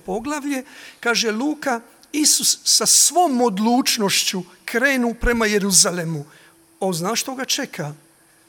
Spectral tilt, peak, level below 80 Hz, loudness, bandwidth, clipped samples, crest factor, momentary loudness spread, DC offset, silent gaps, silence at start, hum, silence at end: -2 dB/octave; 0 dBFS; -40 dBFS; -18 LUFS; 17.5 kHz; under 0.1%; 20 dB; 15 LU; under 0.1%; none; 0.05 s; none; 0.55 s